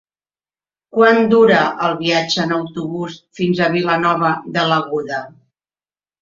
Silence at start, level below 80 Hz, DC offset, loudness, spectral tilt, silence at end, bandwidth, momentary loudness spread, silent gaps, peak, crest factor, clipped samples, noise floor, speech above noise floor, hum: 0.95 s; -58 dBFS; under 0.1%; -16 LUFS; -5.5 dB/octave; 0.9 s; 7.6 kHz; 13 LU; none; 0 dBFS; 16 dB; under 0.1%; under -90 dBFS; over 74 dB; none